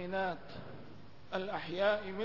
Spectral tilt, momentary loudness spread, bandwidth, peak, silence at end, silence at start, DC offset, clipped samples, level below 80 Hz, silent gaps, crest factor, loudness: -6.5 dB/octave; 20 LU; 6 kHz; -20 dBFS; 0 s; 0 s; 0.3%; under 0.1%; -64 dBFS; none; 18 dB; -36 LUFS